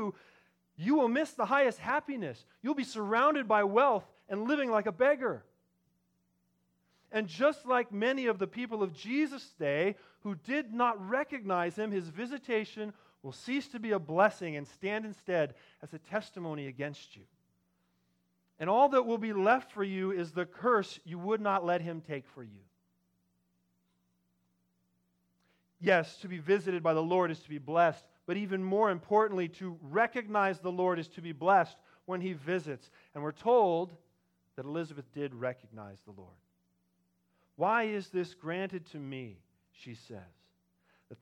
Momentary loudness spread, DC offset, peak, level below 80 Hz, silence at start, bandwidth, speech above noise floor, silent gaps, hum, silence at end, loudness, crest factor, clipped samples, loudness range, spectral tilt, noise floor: 16 LU; under 0.1%; -12 dBFS; -82 dBFS; 0 s; 11.5 kHz; 44 dB; none; none; 0.05 s; -32 LUFS; 22 dB; under 0.1%; 8 LU; -6.5 dB/octave; -77 dBFS